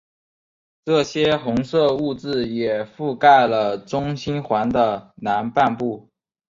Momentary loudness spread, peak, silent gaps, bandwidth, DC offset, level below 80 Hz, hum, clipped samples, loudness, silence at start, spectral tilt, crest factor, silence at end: 12 LU; -2 dBFS; none; 7.6 kHz; under 0.1%; -54 dBFS; none; under 0.1%; -20 LUFS; 0.85 s; -6 dB/octave; 18 dB; 0.6 s